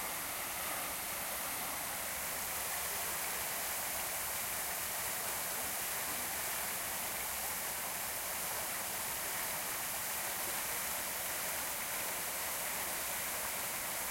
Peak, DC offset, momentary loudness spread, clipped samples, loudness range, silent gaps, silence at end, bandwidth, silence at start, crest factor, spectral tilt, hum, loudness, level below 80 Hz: -22 dBFS; under 0.1%; 1 LU; under 0.1%; 1 LU; none; 0 s; 16.5 kHz; 0 s; 16 dB; -0.5 dB/octave; none; -36 LUFS; -64 dBFS